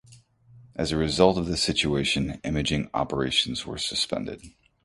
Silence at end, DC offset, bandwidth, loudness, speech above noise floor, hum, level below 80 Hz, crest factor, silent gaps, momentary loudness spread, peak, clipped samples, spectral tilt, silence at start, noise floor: 0.35 s; under 0.1%; 11.5 kHz; -25 LUFS; 29 dB; none; -44 dBFS; 24 dB; none; 10 LU; -2 dBFS; under 0.1%; -4 dB/octave; 0.1 s; -54 dBFS